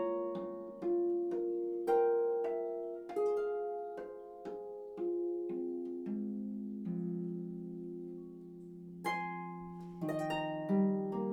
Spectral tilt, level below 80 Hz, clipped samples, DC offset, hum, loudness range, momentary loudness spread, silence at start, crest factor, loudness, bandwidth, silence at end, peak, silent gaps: -8 dB/octave; -74 dBFS; under 0.1%; under 0.1%; none; 7 LU; 14 LU; 0 s; 16 dB; -38 LUFS; 15 kHz; 0 s; -22 dBFS; none